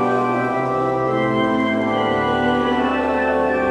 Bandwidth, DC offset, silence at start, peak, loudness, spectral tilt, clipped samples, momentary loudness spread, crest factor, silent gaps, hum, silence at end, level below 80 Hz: 10.5 kHz; under 0.1%; 0 s; -6 dBFS; -19 LUFS; -7 dB/octave; under 0.1%; 2 LU; 12 dB; none; none; 0 s; -44 dBFS